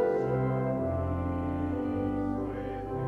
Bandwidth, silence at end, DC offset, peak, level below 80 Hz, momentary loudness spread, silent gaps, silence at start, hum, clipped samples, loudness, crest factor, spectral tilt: 5.6 kHz; 0 s; under 0.1%; -18 dBFS; -46 dBFS; 6 LU; none; 0 s; none; under 0.1%; -31 LUFS; 12 dB; -10.5 dB/octave